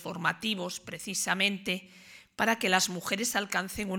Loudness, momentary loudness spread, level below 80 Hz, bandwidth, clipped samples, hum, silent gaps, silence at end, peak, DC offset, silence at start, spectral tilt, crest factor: -29 LUFS; 10 LU; -64 dBFS; 19 kHz; under 0.1%; none; none; 0 s; -8 dBFS; under 0.1%; 0 s; -2.5 dB/octave; 24 dB